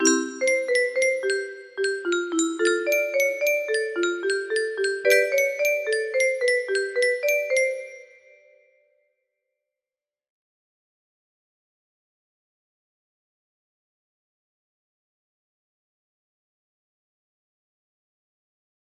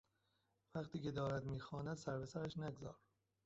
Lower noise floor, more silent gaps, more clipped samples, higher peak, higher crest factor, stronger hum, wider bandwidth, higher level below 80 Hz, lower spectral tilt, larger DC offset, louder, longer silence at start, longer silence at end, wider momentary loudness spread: first, under -90 dBFS vs -84 dBFS; neither; neither; first, -6 dBFS vs -30 dBFS; about the same, 22 dB vs 18 dB; neither; first, 15 kHz vs 8 kHz; second, -76 dBFS vs -68 dBFS; second, 0 dB/octave vs -6.5 dB/octave; neither; first, -23 LUFS vs -47 LUFS; second, 0 s vs 0.75 s; first, 10.95 s vs 0.5 s; second, 6 LU vs 10 LU